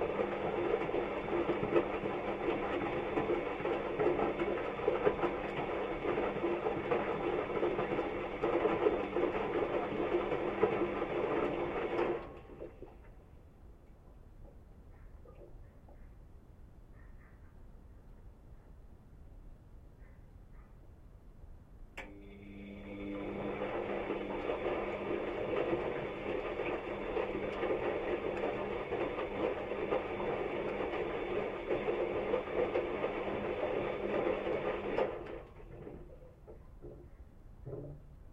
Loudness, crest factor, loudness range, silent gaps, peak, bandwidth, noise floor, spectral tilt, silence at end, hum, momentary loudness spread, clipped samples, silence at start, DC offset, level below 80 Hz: -36 LUFS; 22 dB; 11 LU; none; -14 dBFS; 7.8 kHz; -56 dBFS; -7.5 dB/octave; 0 s; none; 18 LU; under 0.1%; 0 s; under 0.1%; -56 dBFS